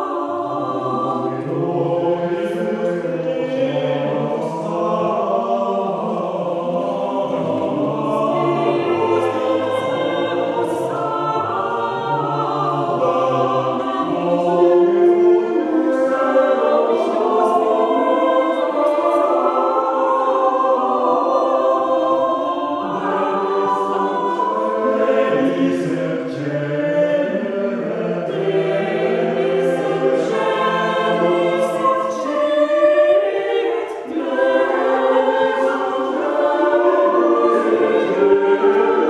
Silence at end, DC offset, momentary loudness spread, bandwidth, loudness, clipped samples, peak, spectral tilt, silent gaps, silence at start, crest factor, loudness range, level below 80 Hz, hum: 0 s; under 0.1%; 7 LU; 11 kHz; -18 LUFS; under 0.1%; -2 dBFS; -7 dB/octave; none; 0 s; 16 dB; 4 LU; -64 dBFS; none